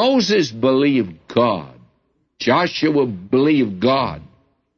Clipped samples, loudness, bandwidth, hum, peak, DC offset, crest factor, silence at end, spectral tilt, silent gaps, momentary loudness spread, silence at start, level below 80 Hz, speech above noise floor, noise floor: under 0.1%; -18 LUFS; 7 kHz; none; -4 dBFS; under 0.1%; 14 dB; 0.55 s; -5.5 dB/octave; none; 7 LU; 0 s; -54 dBFS; 48 dB; -65 dBFS